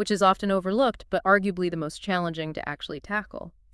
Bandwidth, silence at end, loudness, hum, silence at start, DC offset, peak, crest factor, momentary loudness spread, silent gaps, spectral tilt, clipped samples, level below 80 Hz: 12 kHz; 0.25 s; -26 LUFS; none; 0 s; under 0.1%; -6 dBFS; 20 dB; 12 LU; none; -5.5 dB/octave; under 0.1%; -54 dBFS